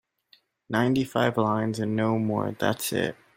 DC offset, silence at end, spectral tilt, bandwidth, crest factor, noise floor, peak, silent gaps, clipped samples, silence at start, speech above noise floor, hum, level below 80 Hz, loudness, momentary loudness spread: under 0.1%; 0.25 s; -5.5 dB/octave; 16.5 kHz; 18 dB; -63 dBFS; -8 dBFS; none; under 0.1%; 0.7 s; 37 dB; none; -62 dBFS; -26 LUFS; 4 LU